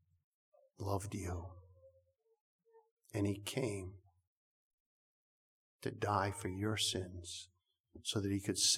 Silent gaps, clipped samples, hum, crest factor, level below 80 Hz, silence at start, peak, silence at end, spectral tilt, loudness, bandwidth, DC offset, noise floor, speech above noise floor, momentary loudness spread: 2.40-2.59 s, 2.91-2.97 s, 4.27-5.79 s, 7.80-7.84 s; under 0.1%; none; 22 dB; -68 dBFS; 0.8 s; -20 dBFS; 0 s; -3.5 dB/octave; -40 LUFS; 16.5 kHz; under 0.1%; -75 dBFS; 36 dB; 12 LU